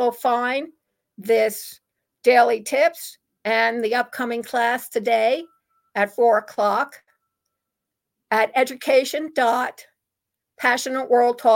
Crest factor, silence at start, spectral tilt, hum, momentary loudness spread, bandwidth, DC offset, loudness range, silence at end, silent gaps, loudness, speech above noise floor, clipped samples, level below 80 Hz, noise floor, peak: 18 dB; 0 s; -2.5 dB/octave; none; 12 LU; 17 kHz; under 0.1%; 3 LU; 0 s; none; -21 LUFS; 63 dB; under 0.1%; -78 dBFS; -83 dBFS; -4 dBFS